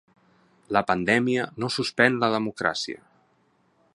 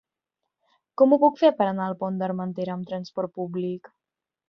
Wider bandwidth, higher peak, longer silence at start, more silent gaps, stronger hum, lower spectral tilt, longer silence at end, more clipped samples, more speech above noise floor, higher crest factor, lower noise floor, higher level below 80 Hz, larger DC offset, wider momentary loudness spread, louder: first, 11.5 kHz vs 6.4 kHz; first, -2 dBFS vs -6 dBFS; second, 0.7 s vs 1 s; neither; neither; second, -4.5 dB/octave vs -8.5 dB/octave; first, 1 s vs 0.7 s; neither; second, 41 dB vs 65 dB; about the same, 24 dB vs 20 dB; second, -65 dBFS vs -88 dBFS; first, -62 dBFS vs -72 dBFS; neither; second, 9 LU vs 14 LU; about the same, -24 LUFS vs -24 LUFS